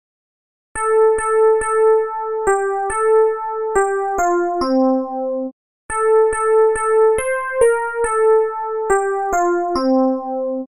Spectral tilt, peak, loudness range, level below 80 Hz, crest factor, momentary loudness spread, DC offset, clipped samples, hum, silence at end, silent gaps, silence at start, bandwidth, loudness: -4 dB/octave; -2 dBFS; 2 LU; -44 dBFS; 14 dB; 8 LU; under 0.1%; under 0.1%; none; 0.05 s; 5.52-5.89 s; 0.75 s; 11.5 kHz; -17 LUFS